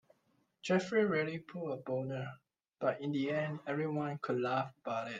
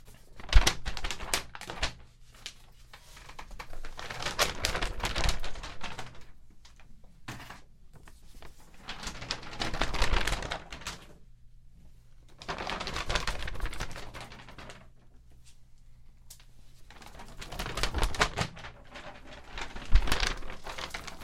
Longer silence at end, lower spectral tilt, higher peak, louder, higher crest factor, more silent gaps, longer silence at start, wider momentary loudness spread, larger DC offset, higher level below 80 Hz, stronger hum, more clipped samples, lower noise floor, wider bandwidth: about the same, 0 s vs 0 s; first, -6.5 dB/octave vs -3 dB/octave; second, -18 dBFS vs -4 dBFS; about the same, -36 LUFS vs -34 LUFS; second, 18 dB vs 30 dB; neither; first, 0.65 s vs 0.05 s; second, 10 LU vs 24 LU; neither; second, -80 dBFS vs -36 dBFS; neither; neither; first, -76 dBFS vs -53 dBFS; second, 9.2 kHz vs 15.5 kHz